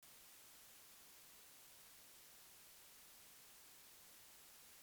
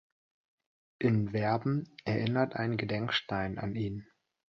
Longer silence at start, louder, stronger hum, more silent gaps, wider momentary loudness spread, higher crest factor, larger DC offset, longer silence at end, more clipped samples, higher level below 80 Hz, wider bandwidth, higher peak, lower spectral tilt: second, 0 s vs 1 s; second, -60 LUFS vs -32 LUFS; neither; neither; second, 0 LU vs 6 LU; second, 14 dB vs 20 dB; neither; second, 0 s vs 0.5 s; neither; second, -88 dBFS vs -60 dBFS; first, over 20 kHz vs 6.4 kHz; second, -50 dBFS vs -14 dBFS; second, 0 dB/octave vs -8 dB/octave